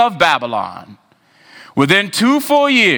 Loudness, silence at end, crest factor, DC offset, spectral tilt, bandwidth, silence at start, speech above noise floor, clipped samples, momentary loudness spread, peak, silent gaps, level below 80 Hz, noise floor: -14 LUFS; 0 s; 14 dB; under 0.1%; -4 dB/octave; over 20 kHz; 0 s; 35 dB; under 0.1%; 11 LU; 0 dBFS; none; -58 dBFS; -49 dBFS